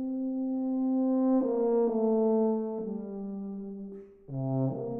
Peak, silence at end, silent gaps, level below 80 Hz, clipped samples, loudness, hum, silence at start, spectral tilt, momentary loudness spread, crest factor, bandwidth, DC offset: -16 dBFS; 0 s; none; -64 dBFS; under 0.1%; -29 LUFS; none; 0 s; -14.5 dB/octave; 14 LU; 12 dB; 2.1 kHz; under 0.1%